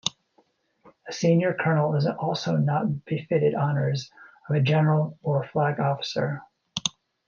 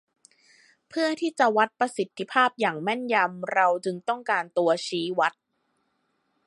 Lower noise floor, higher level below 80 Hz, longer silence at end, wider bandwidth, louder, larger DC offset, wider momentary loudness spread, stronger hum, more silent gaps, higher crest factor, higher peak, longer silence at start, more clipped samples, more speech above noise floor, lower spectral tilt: second, -66 dBFS vs -74 dBFS; first, -68 dBFS vs -82 dBFS; second, 0.4 s vs 1.15 s; second, 7.2 kHz vs 11.5 kHz; about the same, -25 LUFS vs -25 LUFS; neither; first, 9 LU vs 6 LU; neither; neither; about the same, 20 dB vs 20 dB; about the same, -6 dBFS vs -6 dBFS; second, 0.05 s vs 0.95 s; neither; second, 42 dB vs 49 dB; first, -6 dB/octave vs -4 dB/octave